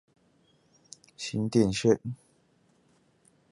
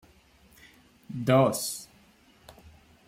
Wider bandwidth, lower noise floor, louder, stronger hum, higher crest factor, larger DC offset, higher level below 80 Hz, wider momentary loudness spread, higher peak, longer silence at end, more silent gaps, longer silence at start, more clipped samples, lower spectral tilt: second, 11.5 kHz vs 16.5 kHz; first, -67 dBFS vs -59 dBFS; about the same, -28 LUFS vs -26 LUFS; neither; about the same, 22 dB vs 22 dB; neither; about the same, -60 dBFS vs -64 dBFS; first, 26 LU vs 17 LU; about the same, -10 dBFS vs -10 dBFS; about the same, 1.35 s vs 1.25 s; neither; about the same, 1.2 s vs 1.1 s; neither; about the same, -6 dB/octave vs -5.5 dB/octave